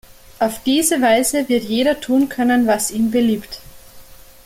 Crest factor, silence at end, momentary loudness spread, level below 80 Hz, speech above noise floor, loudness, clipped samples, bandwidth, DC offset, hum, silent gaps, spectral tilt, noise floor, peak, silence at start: 16 dB; 0.3 s; 7 LU; -48 dBFS; 24 dB; -17 LUFS; under 0.1%; 16.5 kHz; under 0.1%; none; none; -3 dB/octave; -41 dBFS; -2 dBFS; 0.4 s